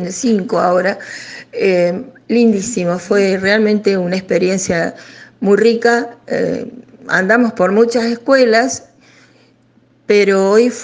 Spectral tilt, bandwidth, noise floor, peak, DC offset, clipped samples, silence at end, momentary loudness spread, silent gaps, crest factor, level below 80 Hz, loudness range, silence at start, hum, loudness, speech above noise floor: -5 dB/octave; 9.8 kHz; -52 dBFS; 0 dBFS; under 0.1%; under 0.1%; 0 s; 11 LU; none; 14 dB; -56 dBFS; 2 LU; 0 s; none; -14 LUFS; 38 dB